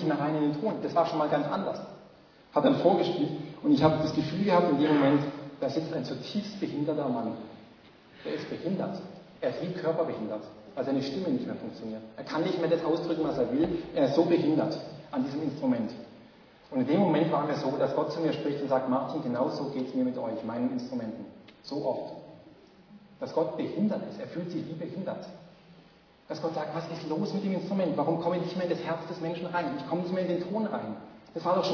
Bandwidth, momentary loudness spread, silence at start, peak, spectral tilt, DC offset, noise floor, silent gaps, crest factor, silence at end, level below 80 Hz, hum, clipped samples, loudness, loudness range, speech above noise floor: 5.4 kHz; 14 LU; 0 s; -8 dBFS; -7.5 dB/octave; under 0.1%; -58 dBFS; none; 22 dB; 0 s; -66 dBFS; none; under 0.1%; -30 LUFS; 8 LU; 29 dB